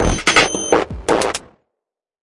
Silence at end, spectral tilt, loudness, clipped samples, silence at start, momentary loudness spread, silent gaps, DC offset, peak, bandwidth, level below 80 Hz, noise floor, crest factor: 0.8 s; -3 dB/octave; -16 LUFS; under 0.1%; 0 s; 8 LU; none; under 0.1%; 0 dBFS; 11.5 kHz; -32 dBFS; -83 dBFS; 18 dB